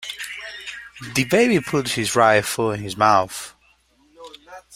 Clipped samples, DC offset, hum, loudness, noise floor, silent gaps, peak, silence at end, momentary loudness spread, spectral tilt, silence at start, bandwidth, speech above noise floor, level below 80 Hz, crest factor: under 0.1%; under 0.1%; none; -19 LUFS; -59 dBFS; none; -2 dBFS; 0 s; 17 LU; -4 dB/octave; 0 s; 16 kHz; 40 dB; -56 dBFS; 20 dB